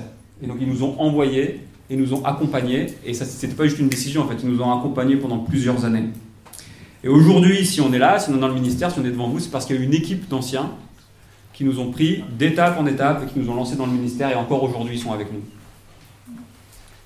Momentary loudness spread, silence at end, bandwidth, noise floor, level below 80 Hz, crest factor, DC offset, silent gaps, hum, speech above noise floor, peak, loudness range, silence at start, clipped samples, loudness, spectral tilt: 12 LU; 0.6 s; 16 kHz; -49 dBFS; -50 dBFS; 18 dB; under 0.1%; none; none; 29 dB; -2 dBFS; 6 LU; 0 s; under 0.1%; -20 LUFS; -6 dB/octave